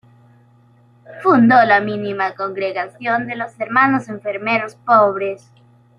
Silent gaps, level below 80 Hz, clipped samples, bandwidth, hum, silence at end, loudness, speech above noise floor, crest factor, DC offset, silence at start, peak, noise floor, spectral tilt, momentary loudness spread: none; -64 dBFS; under 0.1%; 10 kHz; none; 0.6 s; -17 LUFS; 34 dB; 16 dB; under 0.1%; 1.1 s; -2 dBFS; -51 dBFS; -7 dB/octave; 14 LU